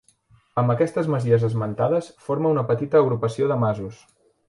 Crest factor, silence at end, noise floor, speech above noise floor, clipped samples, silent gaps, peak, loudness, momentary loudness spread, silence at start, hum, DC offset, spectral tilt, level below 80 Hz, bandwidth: 16 dB; 0.55 s; -58 dBFS; 37 dB; under 0.1%; none; -6 dBFS; -22 LUFS; 8 LU; 0.55 s; none; under 0.1%; -8.5 dB/octave; -58 dBFS; 11.5 kHz